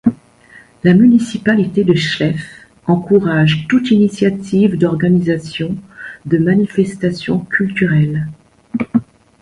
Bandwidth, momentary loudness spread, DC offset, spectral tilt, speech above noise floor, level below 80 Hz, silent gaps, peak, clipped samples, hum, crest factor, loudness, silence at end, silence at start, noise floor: 11 kHz; 11 LU; under 0.1%; -7.5 dB/octave; 31 dB; -48 dBFS; none; 0 dBFS; under 0.1%; none; 14 dB; -14 LUFS; 0.4 s; 0.05 s; -44 dBFS